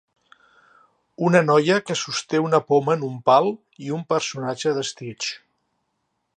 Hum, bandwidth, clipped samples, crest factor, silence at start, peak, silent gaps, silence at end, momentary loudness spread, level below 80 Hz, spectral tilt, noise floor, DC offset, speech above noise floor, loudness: none; 9.6 kHz; under 0.1%; 22 dB; 1.2 s; -2 dBFS; none; 1 s; 12 LU; -72 dBFS; -5 dB/octave; -74 dBFS; under 0.1%; 53 dB; -21 LUFS